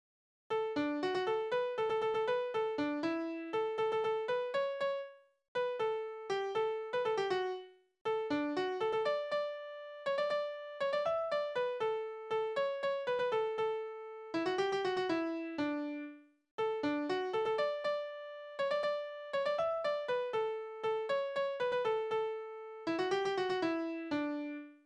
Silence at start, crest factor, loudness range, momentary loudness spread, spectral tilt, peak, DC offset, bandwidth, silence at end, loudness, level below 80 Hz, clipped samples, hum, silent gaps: 0.5 s; 14 dB; 2 LU; 7 LU; -5 dB/octave; -22 dBFS; under 0.1%; 10 kHz; 0.1 s; -36 LUFS; -78 dBFS; under 0.1%; none; 5.48-5.55 s, 8.01-8.05 s, 16.51-16.58 s